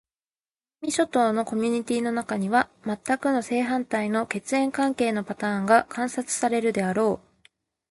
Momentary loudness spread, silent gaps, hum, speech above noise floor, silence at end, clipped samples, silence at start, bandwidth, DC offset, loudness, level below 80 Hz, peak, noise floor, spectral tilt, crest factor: 7 LU; none; none; over 66 dB; 0.75 s; under 0.1%; 0.8 s; 11.5 kHz; under 0.1%; -25 LUFS; -66 dBFS; -4 dBFS; under -90 dBFS; -4.5 dB/octave; 20 dB